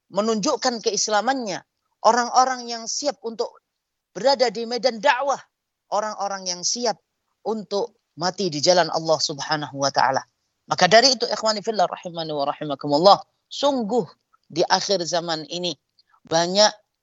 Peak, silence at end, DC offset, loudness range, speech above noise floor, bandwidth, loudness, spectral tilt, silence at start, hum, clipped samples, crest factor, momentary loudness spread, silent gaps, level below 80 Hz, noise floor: 0 dBFS; 0.25 s; under 0.1%; 5 LU; 58 dB; 8.2 kHz; -21 LUFS; -2.5 dB/octave; 0.1 s; none; under 0.1%; 22 dB; 12 LU; none; -74 dBFS; -80 dBFS